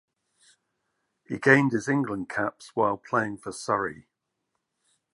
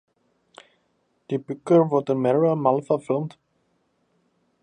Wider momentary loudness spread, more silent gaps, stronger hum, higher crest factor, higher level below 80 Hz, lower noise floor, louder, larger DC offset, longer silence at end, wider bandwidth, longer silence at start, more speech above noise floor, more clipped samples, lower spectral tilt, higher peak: about the same, 13 LU vs 12 LU; neither; neither; about the same, 24 dB vs 20 dB; first, -66 dBFS vs -72 dBFS; first, -80 dBFS vs -69 dBFS; second, -26 LUFS vs -22 LUFS; neither; second, 1.15 s vs 1.35 s; first, 11.5 kHz vs 9.8 kHz; about the same, 1.3 s vs 1.3 s; first, 55 dB vs 48 dB; neither; second, -6 dB/octave vs -9 dB/octave; about the same, -4 dBFS vs -6 dBFS